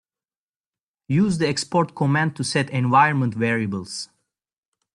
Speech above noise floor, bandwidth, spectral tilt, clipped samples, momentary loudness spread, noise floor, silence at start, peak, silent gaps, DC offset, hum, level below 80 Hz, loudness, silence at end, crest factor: over 69 dB; 11 kHz; -5.5 dB/octave; under 0.1%; 12 LU; under -90 dBFS; 1.1 s; -4 dBFS; none; under 0.1%; none; -60 dBFS; -21 LUFS; 0.9 s; 18 dB